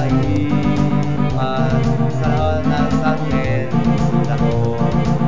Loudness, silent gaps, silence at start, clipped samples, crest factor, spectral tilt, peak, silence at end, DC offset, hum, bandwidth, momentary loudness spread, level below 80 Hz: -17 LUFS; none; 0 s; under 0.1%; 12 dB; -8 dB/octave; -6 dBFS; 0 s; 6%; none; 7.6 kHz; 2 LU; -30 dBFS